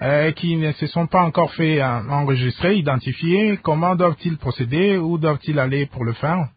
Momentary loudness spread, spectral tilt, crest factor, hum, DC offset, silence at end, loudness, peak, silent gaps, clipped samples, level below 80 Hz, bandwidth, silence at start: 5 LU; -12.5 dB/octave; 16 dB; none; under 0.1%; 0.1 s; -19 LUFS; -2 dBFS; none; under 0.1%; -48 dBFS; 5 kHz; 0 s